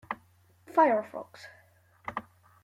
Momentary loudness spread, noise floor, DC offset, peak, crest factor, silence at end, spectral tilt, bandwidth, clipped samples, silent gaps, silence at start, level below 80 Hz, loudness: 24 LU; -62 dBFS; under 0.1%; -12 dBFS; 20 dB; 0.4 s; -6 dB/octave; 15 kHz; under 0.1%; none; 0.1 s; -74 dBFS; -29 LUFS